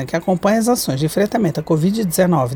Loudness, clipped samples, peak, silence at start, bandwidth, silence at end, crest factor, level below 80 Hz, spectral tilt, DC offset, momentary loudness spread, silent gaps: -17 LUFS; under 0.1%; -4 dBFS; 0 s; over 20 kHz; 0 s; 14 dB; -48 dBFS; -6 dB/octave; under 0.1%; 3 LU; none